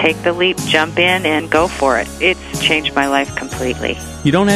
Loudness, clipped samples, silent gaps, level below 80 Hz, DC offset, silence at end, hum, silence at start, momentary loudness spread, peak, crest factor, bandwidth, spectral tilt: -15 LUFS; under 0.1%; none; -36 dBFS; under 0.1%; 0 s; none; 0 s; 8 LU; 0 dBFS; 16 dB; 15.5 kHz; -4 dB/octave